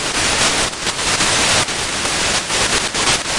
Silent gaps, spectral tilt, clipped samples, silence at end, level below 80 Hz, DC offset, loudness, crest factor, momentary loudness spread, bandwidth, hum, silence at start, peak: none; -1 dB/octave; under 0.1%; 0 s; -36 dBFS; under 0.1%; -15 LUFS; 14 dB; 5 LU; 11.5 kHz; none; 0 s; -4 dBFS